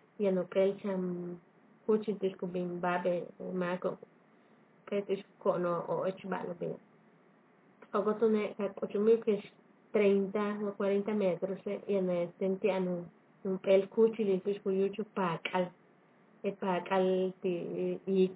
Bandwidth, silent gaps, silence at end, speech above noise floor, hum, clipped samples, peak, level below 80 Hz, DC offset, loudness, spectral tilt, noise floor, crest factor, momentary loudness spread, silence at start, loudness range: 4 kHz; none; 0 s; 32 dB; none; under 0.1%; -16 dBFS; -86 dBFS; under 0.1%; -33 LUFS; -6 dB/octave; -64 dBFS; 18 dB; 11 LU; 0.2 s; 5 LU